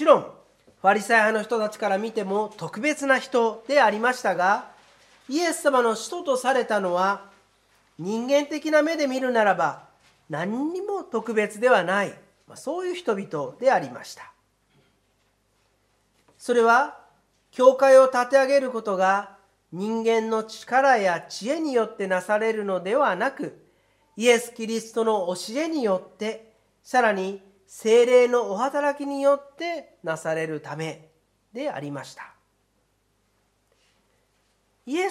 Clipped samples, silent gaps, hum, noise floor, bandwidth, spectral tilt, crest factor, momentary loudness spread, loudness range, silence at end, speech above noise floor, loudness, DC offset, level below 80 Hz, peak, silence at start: under 0.1%; none; none; -69 dBFS; 14.5 kHz; -4 dB/octave; 22 dB; 14 LU; 10 LU; 0 s; 46 dB; -23 LUFS; under 0.1%; -76 dBFS; -2 dBFS; 0 s